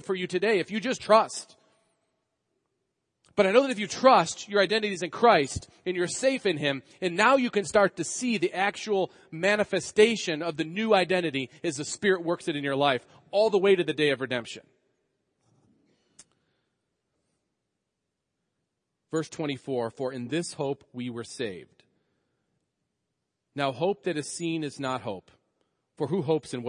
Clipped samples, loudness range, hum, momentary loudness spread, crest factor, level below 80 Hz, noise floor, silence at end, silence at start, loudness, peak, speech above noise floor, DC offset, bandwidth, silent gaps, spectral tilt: under 0.1%; 12 LU; none; 12 LU; 24 dB; -66 dBFS; -83 dBFS; 0 s; 0.05 s; -26 LUFS; -4 dBFS; 57 dB; under 0.1%; 10.5 kHz; none; -4 dB/octave